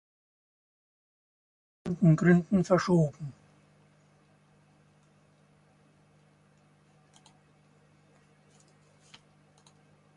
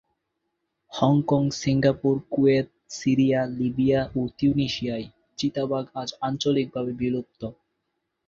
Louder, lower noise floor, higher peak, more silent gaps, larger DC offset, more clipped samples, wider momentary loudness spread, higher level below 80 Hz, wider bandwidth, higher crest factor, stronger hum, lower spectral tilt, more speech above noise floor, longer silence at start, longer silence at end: about the same, -25 LUFS vs -24 LUFS; second, -63 dBFS vs -78 dBFS; second, -10 dBFS vs -6 dBFS; neither; neither; neither; first, 20 LU vs 12 LU; second, -64 dBFS vs -54 dBFS; first, 9.2 kHz vs 7.6 kHz; first, 24 dB vs 18 dB; first, 50 Hz at -60 dBFS vs none; first, -8 dB/octave vs -6.5 dB/octave; second, 39 dB vs 55 dB; first, 1.85 s vs 0.9 s; first, 6.85 s vs 0.75 s